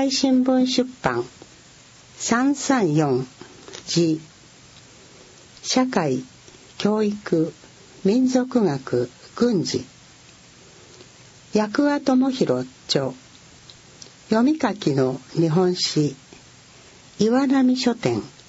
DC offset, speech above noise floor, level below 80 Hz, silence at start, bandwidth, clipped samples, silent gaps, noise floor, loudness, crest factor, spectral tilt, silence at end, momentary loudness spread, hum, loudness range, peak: under 0.1%; 28 dB; -60 dBFS; 0 s; 8 kHz; under 0.1%; none; -49 dBFS; -21 LUFS; 18 dB; -5 dB/octave; 0.2 s; 12 LU; none; 4 LU; -4 dBFS